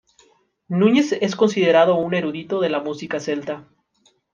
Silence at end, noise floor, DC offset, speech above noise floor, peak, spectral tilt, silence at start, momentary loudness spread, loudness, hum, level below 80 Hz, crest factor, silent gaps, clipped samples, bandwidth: 0.75 s; -62 dBFS; under 0.1%; 43 dB; -2 dBFS; -6 dB/octave; 0.7 s; 11 LU; -19 LUFS; none; -68 dBFS; 18 dB; none; under 0.1%; 9.2 kHz